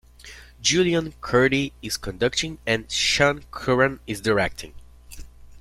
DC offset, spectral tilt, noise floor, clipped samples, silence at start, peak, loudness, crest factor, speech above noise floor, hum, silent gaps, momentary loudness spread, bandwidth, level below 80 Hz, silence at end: under 0.1%; -3.5 dB/octave; -45 dBFS; under 0.1%; 0.25 s; -4 dBFS; -22 LUFS; 20 dB; 22 dB; none; none; 14 LU; 15.5 kHz; -44 dBFS; 0 s